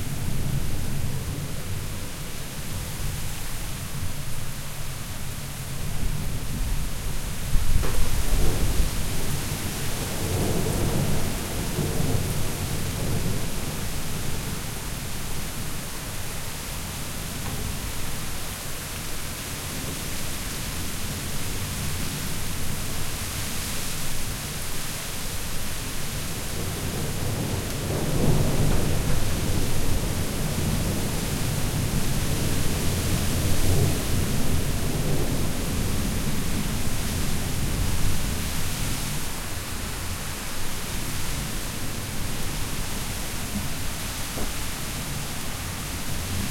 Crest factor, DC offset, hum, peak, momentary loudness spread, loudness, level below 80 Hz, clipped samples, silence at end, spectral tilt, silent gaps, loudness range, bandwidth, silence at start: 20 dB; under 0.1%; none; -6 dBFS; 7 LU; -29 LUFS; -32 dBFS; under 0.1%; 0 s; -4 dB/octave; none; 6 LU; 16.5 kHz; 0 s